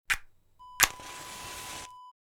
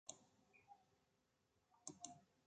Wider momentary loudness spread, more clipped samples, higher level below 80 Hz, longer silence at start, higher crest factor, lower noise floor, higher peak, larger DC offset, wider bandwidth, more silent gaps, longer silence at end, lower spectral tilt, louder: first, 17 LU vs 14 LU; neither; first, -54 dBFS vs under -90 dBFS; about the same, 0.1 s vs 0.05 s; about the same, 34 dB vs 30 dB; second, -54 dBFS vs -85 dBFS; first, 0 dBFS vs -34 dBFS; neither; first, over 20 kHz vs 9 kHz; neither; first, 0.2 s vs 0 s; second, 0.5 dB/octave vs -2 dB/octave; first, -30 LUFS vs -59 LUFS